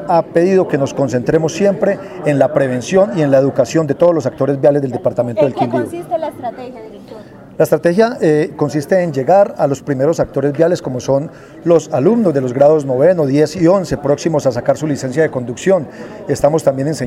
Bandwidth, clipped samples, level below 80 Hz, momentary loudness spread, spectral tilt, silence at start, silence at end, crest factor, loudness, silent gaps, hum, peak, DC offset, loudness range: 14.5 kHz; under 0.1%; -48 dBFS; 8 LU; -7 dB/octave; 0 s; 0 s; 14 dB; -14 LUFS; none; none; 0 dBFS; under 0.1%; 4 LU